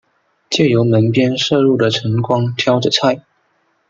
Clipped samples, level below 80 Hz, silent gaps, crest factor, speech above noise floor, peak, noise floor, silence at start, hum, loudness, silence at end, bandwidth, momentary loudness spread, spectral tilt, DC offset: under 0.1%; -58 dBFS; none; 14 dB; 48 dB; 0 dBFS; -62 dBFS; 0.5 s; none; -14 LUFS; 0.7 s; 7.8 kHz; 5 LU; -5.5 dB/octave; under 0.1%